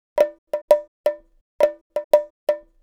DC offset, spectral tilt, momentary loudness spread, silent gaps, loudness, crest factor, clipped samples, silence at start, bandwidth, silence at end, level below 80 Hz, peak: under 0.1%; -3 dB/octave; 10 LU; 0.38-0.47 s, 0.62-0.68 s, 0.88-1.04 s, 1.41-1.59 s, 1.81-1.90 s, 2.04-2.11 s, 2.30-2.47 s; -22 LUFS; 20 dB; under 0.1%; 0.15 s; 17.5 kHz; 0.25 s; -62 dBFS; -2 dBFS